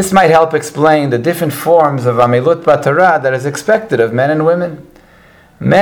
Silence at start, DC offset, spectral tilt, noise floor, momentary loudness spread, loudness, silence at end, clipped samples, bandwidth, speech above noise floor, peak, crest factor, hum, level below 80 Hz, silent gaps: 0 s; under 0.1%; -6 dB/octave; -43 dBFS; 7 LU; -12 LUFS; 0 s; 0.3%; 20 kHz; 32 dB; 0 dBFS; 12 dB; none; -48 dBFS; none